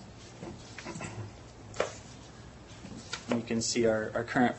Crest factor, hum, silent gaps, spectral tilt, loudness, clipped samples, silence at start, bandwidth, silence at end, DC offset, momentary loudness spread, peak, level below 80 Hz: 22 dB; none; none; -4 dB/octave; -33 LUFS; under 0.1%; 0 s; 8.6 kHz; 0 s; under 0.1%; 21 LU; -12 dBFS; -58 dBFS